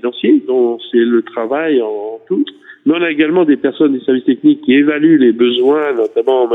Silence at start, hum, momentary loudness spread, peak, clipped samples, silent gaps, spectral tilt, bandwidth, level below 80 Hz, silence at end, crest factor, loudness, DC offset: 0.05 s; none; 8 LU; 0 dBFS; under 0.1%; none; -8 dB/octave; 4 kHz; -66 dBFS; 0 s; 12 dB; -13 LUFS; under 0.1%